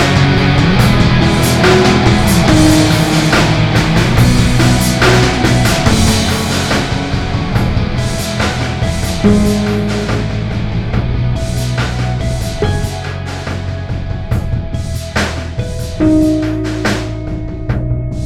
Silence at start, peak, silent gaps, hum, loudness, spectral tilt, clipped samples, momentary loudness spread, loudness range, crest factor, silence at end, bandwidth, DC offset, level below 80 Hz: 0 s; 0 dBFS; none; none; -13 LUFS; -5.5 dB/octave; 0.2%; 11 LU; 8 LU; 12 dB; 0 s; 17 kHz; under 0.1%; -22 dBFS